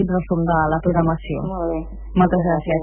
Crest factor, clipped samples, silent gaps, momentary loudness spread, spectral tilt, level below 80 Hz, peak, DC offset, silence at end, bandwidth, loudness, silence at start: 16 dB; under 0.1%; none; 8 LU; -12.5 dB/octave; -34 dBFS; -4 dBFS; under 0.1%; 0 s; 3.3 kHz; -20 LUFS; 0 s